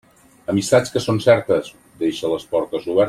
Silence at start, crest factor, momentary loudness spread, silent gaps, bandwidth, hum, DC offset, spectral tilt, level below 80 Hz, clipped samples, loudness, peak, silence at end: 0.5 s; 18 dB; 9 LU; none; 15 kHz; none; under 0.1%; -5.5 dB/octave; -56 dBFS; under 0.1%; -19 LUFS; -2 dBFS; 0 s